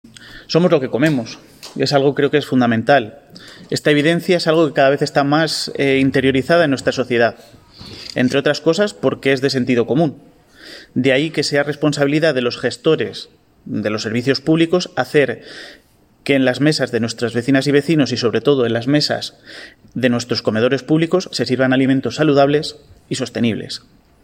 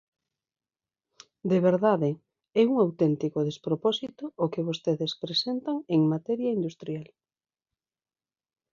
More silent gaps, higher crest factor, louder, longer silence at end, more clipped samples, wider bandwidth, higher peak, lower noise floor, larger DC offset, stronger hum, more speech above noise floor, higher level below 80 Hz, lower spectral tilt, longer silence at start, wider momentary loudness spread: neither; about the same, 16 dB vs 18 dB; first, -16 LUFS vs -27 LUFS; second, 0.45 s vs 1.7 s; neither; first, 16 kHz vs 7.4 kHz; first, 0 dBFS vs -10 dBFS; second, -40 dBFS vs under -90 dBFS; neither; neither; second, 23 dB vs over 64 dB; first, -56 dBFS vs -74 dBFS; second, -5.5 dB/octave vs -7 dB/octave; second, 0.2 s vs 1.45 s; about the same, 13 LU vs 11 LU